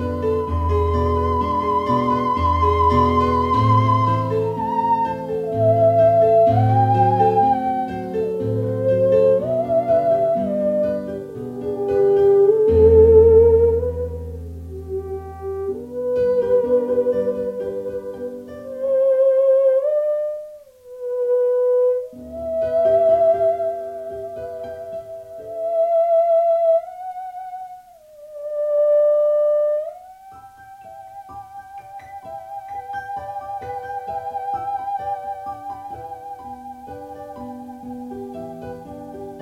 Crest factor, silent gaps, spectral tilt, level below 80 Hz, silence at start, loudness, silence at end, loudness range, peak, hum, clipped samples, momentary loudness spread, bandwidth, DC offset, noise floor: 18 dB; none; -9 dB/octave; -38 dBFS; 0 s; -18 LUFS; 0 s; 15 LU; -2 dBFS; none; under 0.1%; 20 LU; 12 kHz; under 0.1%; -44 dBFS